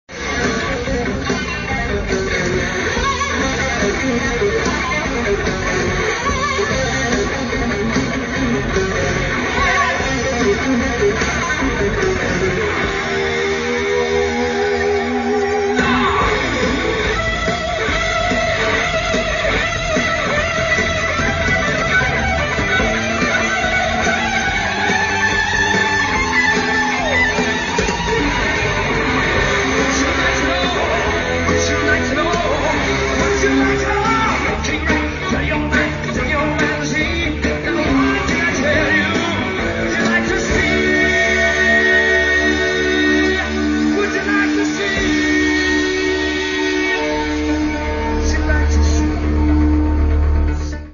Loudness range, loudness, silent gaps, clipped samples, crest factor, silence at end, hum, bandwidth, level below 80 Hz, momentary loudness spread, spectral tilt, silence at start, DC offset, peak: 3 LU; -16 LUFS; none; under 0.1%; 14 dB; 0 s; none; 7.4 kHz; -28 dBFS; 4 LU; -4.5 dB/octave; 0.1 s; under 0.1%; -2 dBFS